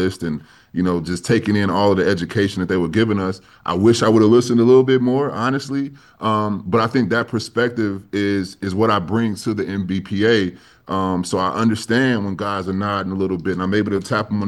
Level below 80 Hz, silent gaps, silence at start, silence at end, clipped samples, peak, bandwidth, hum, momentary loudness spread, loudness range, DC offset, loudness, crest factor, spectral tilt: -52 dBFS; none; 0 s; 0 s; under 0.1%; -2 dBFS; 12.5 kHz; none; 10 LU; 4 LU; under 0.1%; -19 LUFS; 16 dB; -6 dB/octave